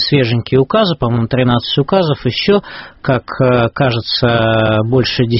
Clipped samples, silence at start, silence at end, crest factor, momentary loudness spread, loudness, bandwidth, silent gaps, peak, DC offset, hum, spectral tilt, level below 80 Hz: under 0.1%; 0 s; 0 s; 14 dB; 4 LU; -14 LUFS; 6 kHz; none; 0 dBFS; under 0.1%; none; -5 dB/octave; -38 dBFS